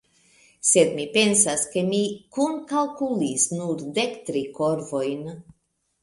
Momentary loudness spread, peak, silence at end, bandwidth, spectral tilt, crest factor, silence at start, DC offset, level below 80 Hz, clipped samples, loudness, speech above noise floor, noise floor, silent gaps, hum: 11 LU; -4 dBFS; 0.6 s; 11.5 kHz; -3 dB/octave; 22 dB; 0.65 s; under 0.1%; -64 dBFS; under 0.1%; -23 LUFS; 35 dB; -58 dBFS; none; none